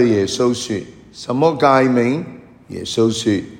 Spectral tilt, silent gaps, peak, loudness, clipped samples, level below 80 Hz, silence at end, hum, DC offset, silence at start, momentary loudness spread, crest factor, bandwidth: -5.5 dB/octave; none; 0 dBFS; -17 LUFS; under 0.1%; -54 dBFS; 0 s; none; under 0.1%; 0 s; 19 LU; 16 dB; 16 kHz